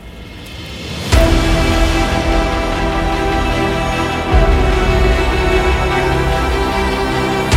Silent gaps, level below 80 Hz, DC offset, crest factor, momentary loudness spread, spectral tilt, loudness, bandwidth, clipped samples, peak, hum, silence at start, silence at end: none; -18 dBFS; under 0.1%; 14 dB; 10 LU; -5.5 dB/octave; -15 LUFS; 16 kHz; under 0.1%; 0 dBFS; none; 0 s; 0 s